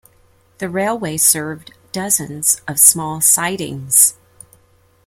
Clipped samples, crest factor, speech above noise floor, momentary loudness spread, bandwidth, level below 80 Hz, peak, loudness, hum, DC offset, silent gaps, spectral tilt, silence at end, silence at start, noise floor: under 0.1%; 18 dB; 38 dB; 17 LU; over 20 kHz; -56 dBFS; 0 dBFS; -13 LUFS; none; under 0.1%; none; -2 dB/octave; 0.95 s; 0.6 s; -54 dBFS